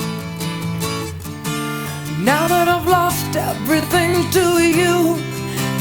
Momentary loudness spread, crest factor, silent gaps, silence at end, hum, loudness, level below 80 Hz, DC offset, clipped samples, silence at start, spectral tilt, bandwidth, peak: 11 LU; 16 dB; none; 0 s; none; -18 LUFS; -46 dBFS; under 0.1%; under 0.1%; 0 s; -4.5 dB/octave; over 20 kHz; -2 dBFS